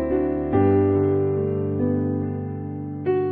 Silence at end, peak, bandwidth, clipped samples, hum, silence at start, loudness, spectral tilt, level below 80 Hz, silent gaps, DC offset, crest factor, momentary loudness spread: 0 s; -10 dBFS; 3.4 kHz; under 0.1%; none; 0 s; -23 LUFS; -13 dB/octave; -46 dBFS; none; under 0.1%; 12 dB; 11 LU